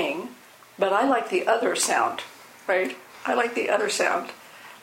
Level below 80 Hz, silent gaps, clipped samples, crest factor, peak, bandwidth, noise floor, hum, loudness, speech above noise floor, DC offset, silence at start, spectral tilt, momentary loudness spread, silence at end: -76 dBFS; none; under 0.1%; 18 dB; -8 dBFS; 16.5 kHz; -48 dBFS; none; -24 LUFS; 25 dB; under 0.1%; 0 s; -2 dB/octave; 17 LU; 0.05 s